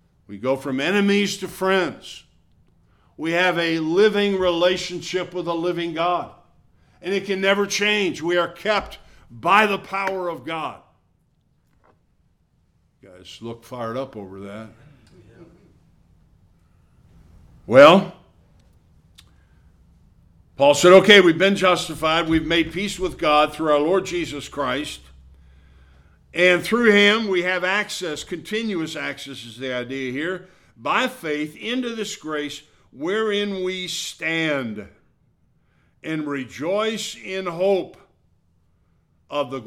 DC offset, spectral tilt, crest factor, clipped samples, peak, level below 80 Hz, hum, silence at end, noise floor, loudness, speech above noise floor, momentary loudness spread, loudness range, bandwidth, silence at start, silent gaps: under 0.1%; -4 dB/octave; 22 dB; under 0.1%; 0 dBFS; -52 dBFS; none; 0 s; -64 dBFS; -20 LUFS; 43 dB; 17 LU; 19 LU; 16 kHz; 0.3 s; none